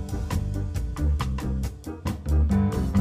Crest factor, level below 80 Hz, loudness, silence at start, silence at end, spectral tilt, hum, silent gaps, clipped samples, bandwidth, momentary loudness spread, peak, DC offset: 14 dB; -28 dBFS; -27 LUFS; 0 s; 0 s; -7.5 dB/octave; none; none; under 0.1%; 15 kHz; 9 LU; -10 dBFS; under 0.1%